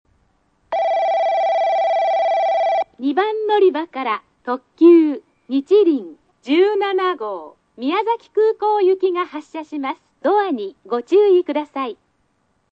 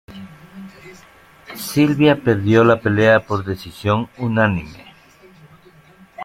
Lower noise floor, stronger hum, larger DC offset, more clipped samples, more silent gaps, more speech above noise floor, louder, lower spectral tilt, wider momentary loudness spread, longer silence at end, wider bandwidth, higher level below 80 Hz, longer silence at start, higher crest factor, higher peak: first, -65 dBFS vs -48 dBFS; neither; neither; neither; neither; first, 48 dB vs 32 dB; about the same, -18 LUFS vs -17 LUFS; second, -5 dB/octave vs -6.5 dB/octave; second, 13 LU vs 24 LU; first, 0.8 s vs 0 s; second, 7.2 kHz vs 16.5 kHz; second, -70 dBFS vs -50 dBFS; first, 0.7 s vs 0.1 s; about the same, 16 dB vs 18 dB; about the same, -2 dBFS vs -2 dBFS